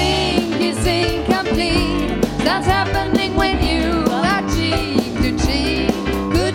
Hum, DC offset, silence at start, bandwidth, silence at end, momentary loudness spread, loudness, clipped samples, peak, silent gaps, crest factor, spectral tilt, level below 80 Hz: none; under 0.1%; 0 s; 17.5 kHz; 0 s; 3 LU; -18 LUFS; under 0.1%; 0 dBFS; none; 16 dB; -5 dB/octave; -28 dBFS